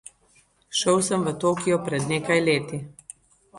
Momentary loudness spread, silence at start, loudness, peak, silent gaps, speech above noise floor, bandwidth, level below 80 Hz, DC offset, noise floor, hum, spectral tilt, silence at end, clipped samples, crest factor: 17 LU; 0.7 s; -23 LUFS; -8 dBFS; none; 38 dB; 11.5 kHz; -60 dBFS; under 0.1%; -61 dBFS; none; -4 dB/octave; 0 s; under 0.1%; 18 dB